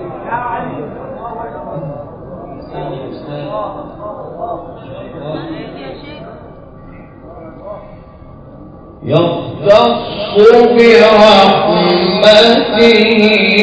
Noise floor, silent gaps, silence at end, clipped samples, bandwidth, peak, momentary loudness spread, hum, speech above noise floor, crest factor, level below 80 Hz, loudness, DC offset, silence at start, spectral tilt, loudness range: -34 dBFS; none; 0 s; 2%; 8 kHz; 0 dBFS; 24 LU; none; 26 dB; 12 dB; -42 dBFS; -9 LUFS; under 0.1%; 0 s; -5.5 dB/octave; 21 LU